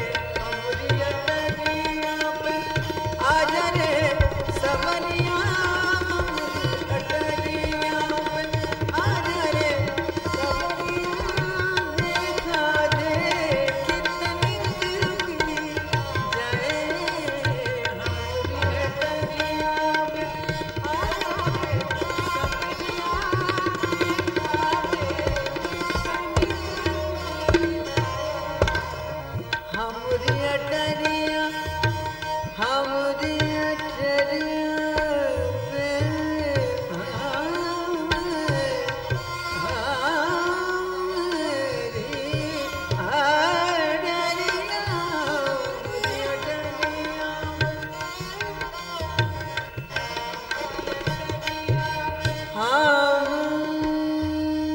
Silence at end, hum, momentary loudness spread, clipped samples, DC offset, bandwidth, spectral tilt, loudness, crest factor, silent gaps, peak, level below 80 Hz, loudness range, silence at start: 0 s; none; 6 LU; under 0.1%; under 0.1%; 16.5 kHz; -5 dB/octave; -25 LUFS; 20 dB; none; -4 dBFS; -40 dBFS; 3 LU; 0 s